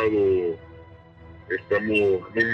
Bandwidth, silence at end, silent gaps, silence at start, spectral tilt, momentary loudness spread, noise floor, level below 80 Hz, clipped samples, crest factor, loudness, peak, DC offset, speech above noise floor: 8.6 kHz; 0 s; none; 0 s; -7.5 dB/octave; 10 LU; -47 dBFS; -54 dBFS; under 0.1%; 16 dB; -23 LUFS; -8 dBFS; under 0.1%; 24 dB